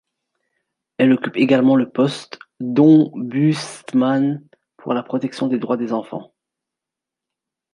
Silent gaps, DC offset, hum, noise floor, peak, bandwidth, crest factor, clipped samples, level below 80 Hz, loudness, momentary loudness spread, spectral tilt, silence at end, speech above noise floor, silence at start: none; under 0.1%; none; -86 dBFS; -2 dBFS; 11 kHz; 18 dB; under 0.1%; -68 dBFS; -18 LUFS; 18 LU; -7 dB/octave; 1.5 s; 68 dB; 1 s